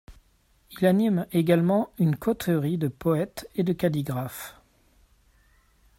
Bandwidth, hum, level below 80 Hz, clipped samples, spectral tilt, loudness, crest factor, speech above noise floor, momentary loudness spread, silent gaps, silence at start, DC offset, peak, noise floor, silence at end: 16.5 kHz; none; -58 dBFS; under 0.1%; -7.5 dB/octave; -25 LUFS; 20 dB; 39 dB; 10 LU; none; 0.1 s; under 0.1%; -8 dBFS; -63 dBFS; 1.45 s